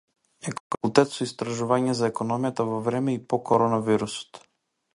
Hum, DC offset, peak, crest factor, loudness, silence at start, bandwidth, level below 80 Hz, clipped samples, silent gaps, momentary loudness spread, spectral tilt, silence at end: none; under 0.1%; -2 dBFS; 24 dB; -25 LUFS; 0.45 s; 11.5 kHz; -64 dBFS; under 0.1%; 0.60-0.70 s; 13 LU; -5.5 dB/octave; 0.55 s